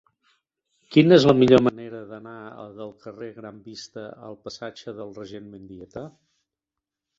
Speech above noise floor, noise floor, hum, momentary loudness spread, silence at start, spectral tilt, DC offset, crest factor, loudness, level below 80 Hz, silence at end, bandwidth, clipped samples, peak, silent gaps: 65 dB; -87 dBFS; none; 25 LU; 0.95 s; -7 dB/octave; under 0.1%; 22 dB; -17 LUFS; -60 dBFS; 1.1 s; 7.6 kHz; under 0.1%; -2 dBFS; none